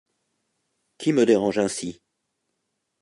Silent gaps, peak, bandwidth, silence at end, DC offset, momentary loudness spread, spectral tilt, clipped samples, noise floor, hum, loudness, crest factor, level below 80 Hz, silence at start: none; -6 dBFS; 11.5 kHz; 1.1 s; under 0.1%; 12 LU; -5 dB/octave; under 0.1%; -78 dBFS; none; -22 LUFS; 20 dB; -66 dBFS; 1 s